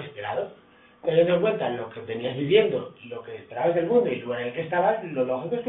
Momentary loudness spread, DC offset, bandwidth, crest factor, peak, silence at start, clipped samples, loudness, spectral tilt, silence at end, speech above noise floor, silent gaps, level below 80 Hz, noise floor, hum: 16 LU; under 0.1%; 4 kHz; 20 dB; -6 dBFS; 0 s; under 0.1%; -25 LUFS; -10.5 dB/octave; 0 s; 30 dB; none; -66 dBFS; -54 dBFS; none